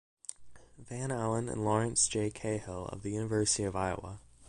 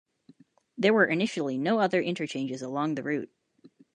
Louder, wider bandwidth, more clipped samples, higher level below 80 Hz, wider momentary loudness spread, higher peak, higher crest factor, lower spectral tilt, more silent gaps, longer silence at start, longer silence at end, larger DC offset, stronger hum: second, -33 LUFS vs -27 LUFS; first, 11.5 kHz vs 10 kHz; neither; first, -56 dBFS vs -78 dBFS; first, 17 LU vs 10 LU; second, -16 dBFS vs -10 dBFS; about the same, 20 dB vs 18 dB; second, -4 dB/octave vs -5.5 dB/octave; neither; second, 0.3 s vs 0.75 s; second, 0.05 s vs 0.3 s; neither; neither